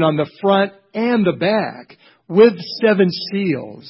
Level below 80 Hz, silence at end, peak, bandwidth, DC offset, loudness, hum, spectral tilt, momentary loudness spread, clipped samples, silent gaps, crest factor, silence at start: -62 dBFS; 0 s; 0 dBFS; 5.8 kHz; under 0.1%; -17 LUFS; none; -10.5 dB/octave; 9 LU; under 0.1%; none; 16 dB; 0 s